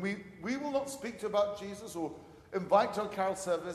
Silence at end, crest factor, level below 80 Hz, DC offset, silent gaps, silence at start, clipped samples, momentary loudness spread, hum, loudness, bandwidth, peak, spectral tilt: 0 s; 22 dB; -68 dBFS; under 0.1%; none; 0 s; under 0.1%; 13 LU; none; -34 LUFS; 13.5 kHz; -12 dBFS; -4.5 dB/octave